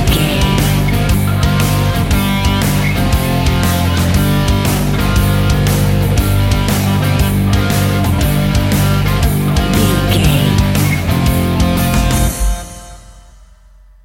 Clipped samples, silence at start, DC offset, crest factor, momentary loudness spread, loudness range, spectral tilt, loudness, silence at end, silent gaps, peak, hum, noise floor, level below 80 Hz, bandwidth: under 0.1%; 0 s; under 0.1%; 12 dB; 2 LU; 1 LU; -5.5 dB/octave; -13 LUFS; 0.85 s; none; 0 dBFS; none; -42 dBFS; -20 dBFS; 17 kHz